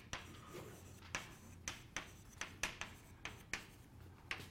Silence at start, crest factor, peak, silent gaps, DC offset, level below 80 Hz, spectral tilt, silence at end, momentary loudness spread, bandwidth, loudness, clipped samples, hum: 0 s; 28 dB; -22 dBFS; none; under 0.1%; -64 dBFS; -2 dB/octave; 0 s; 12 LU; 16 kHz; -49 LUFS; under 0.1%; none